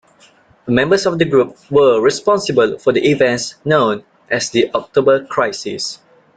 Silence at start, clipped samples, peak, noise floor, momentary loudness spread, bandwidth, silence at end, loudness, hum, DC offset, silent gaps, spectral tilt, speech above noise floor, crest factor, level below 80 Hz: 0.65 s; under 0.1%; 0 dBFS; -50 dBFS; 9 LU; 9.2 kHz; 0.4 s; -15 LUFS; none; under 0.1%; none; -4.5 dB/octave; 35 dB; 14 dB; -52 dBFS